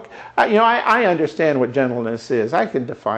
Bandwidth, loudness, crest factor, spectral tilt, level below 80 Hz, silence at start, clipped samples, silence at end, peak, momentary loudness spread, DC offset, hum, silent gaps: 10 kHz; -18 LUFS; 16 dB; -6 dB/octave; -62 dBFS; 0 s; under 0.1%; 0 s; -2 dBFS; 8 LU; under 0.1%; none; none